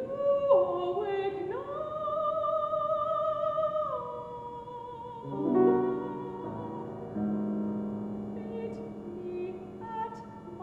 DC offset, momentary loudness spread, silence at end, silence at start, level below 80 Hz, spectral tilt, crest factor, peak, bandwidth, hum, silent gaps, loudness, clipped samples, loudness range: under 0.1%; 15 LU; 0 s; 0 s; -64 dBFS; -9 dB/octave; 20 dB; -12 dBFS; 7.2 kHz; none; none; -32 LUFS; under 0.1%; 6 LU